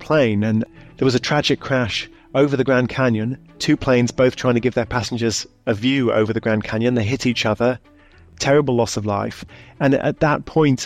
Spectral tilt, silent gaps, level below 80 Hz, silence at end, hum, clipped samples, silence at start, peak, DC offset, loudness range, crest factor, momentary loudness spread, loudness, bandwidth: -5.5 dB/octave; none; -46 dBFS; 0 s; none; under 0.1%; 0 s; -6 dBFS; under 0.1%; 2 LU; 12 dB; 7 LU; -19 LUFS; 13.5 kHz